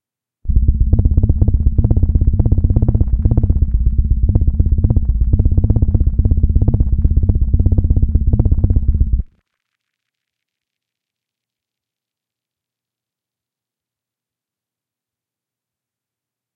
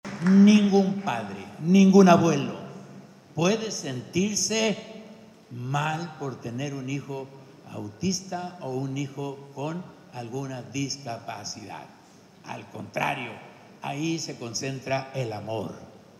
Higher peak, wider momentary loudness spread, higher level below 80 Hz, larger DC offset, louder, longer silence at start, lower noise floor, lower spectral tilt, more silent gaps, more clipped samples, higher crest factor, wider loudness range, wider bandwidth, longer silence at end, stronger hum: first, 0 dBFS vs -4 dBFS; second, 2 LU vs 22 LU; first, -18 dBFS vs -70 dBFS; neither; first, -16 LUFS vs -25 LUFS; first, 0.45 s vs 0.05 s; first, -88 dBFS vs -48 dBFS; first, -15 dB/octave vs -5.5 dB/octave; neither; neither; second, 16 dB vs 22 dB; second, 5 LU vs 12 LU; second, 1.3 kHz vs 12.5 kHz; first, 7.3 s vs 0.3 s; neither